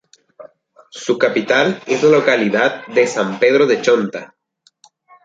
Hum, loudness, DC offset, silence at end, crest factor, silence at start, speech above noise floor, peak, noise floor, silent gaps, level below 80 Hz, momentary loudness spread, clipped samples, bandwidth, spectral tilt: none; -15 LUFS; under 0.1%; 1 s; 16 dB; 0.4 s; 39 dB; -2 dBFS; -54 dBFS; none; -64 dBFS; 11 LU; under 0.1%; 7.8 kHz; -4.5 dB/octave